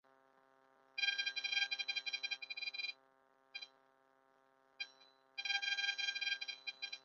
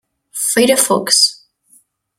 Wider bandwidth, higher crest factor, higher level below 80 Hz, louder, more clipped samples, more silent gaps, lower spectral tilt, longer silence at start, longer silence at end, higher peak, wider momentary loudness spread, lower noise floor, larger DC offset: second, 7.2 kHz vs 16.5 kHz; first, 24 dB vs 16 dB; second, under -90 dBFS vs -62 dBFS; second, -39 LUFS vs -12 LUFS; neither; neither; second, 7 dB/octave vs -1.5 dB/octave; first, 0.95 s vs 0.35 s; second, 0.05 s vs 0.85 s; second, -20 dBFS vs 0 dBFS; first, 15 LU vs 8 LU; first, -73 dBFS vs -53 dBFS; neither